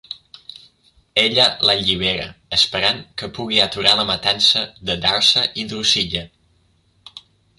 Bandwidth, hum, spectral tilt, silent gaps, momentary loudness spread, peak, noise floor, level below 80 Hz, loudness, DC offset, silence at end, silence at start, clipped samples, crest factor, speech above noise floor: 11.5 kHz; none; -2 dB/octave; none; 12 LU; 0 dBFS; -60 dBFS; -48 dBFS; -16 LUFS; under 0.1%; 0.4 s; 0.1 s; under 0.1%; 20 dB; 41 dB